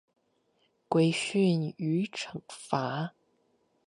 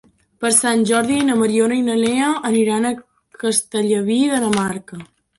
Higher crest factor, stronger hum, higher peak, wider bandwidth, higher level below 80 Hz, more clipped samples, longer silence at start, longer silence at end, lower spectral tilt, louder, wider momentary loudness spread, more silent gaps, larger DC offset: first, 22 dB vs 16 dB; neither; second, -10 dBFS vs -2 dBFS; about the same, 11.5 kHz vs 12 kHz; second, -76 dBFS vs -58 dBFS; neither; first, 0.9 s vs 0.4 s; first, 0.8 s vs 0.35 s; first, -6 dB/octave vs -3.5 dB/octave; second, -30 LUFS vs -17 LUFS; first, 13 LU vs 9 LU; neither; neither